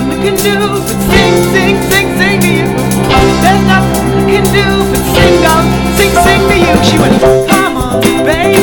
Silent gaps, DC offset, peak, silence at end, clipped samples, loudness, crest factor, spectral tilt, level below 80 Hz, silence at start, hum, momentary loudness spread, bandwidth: none; under 0.1%; 0 dBFS; 0 s; 1%; -8 LUFS; 8 dB; -5 dB/octave; -22 dBFS; 0 s; none; 4 LU; over 20 kHz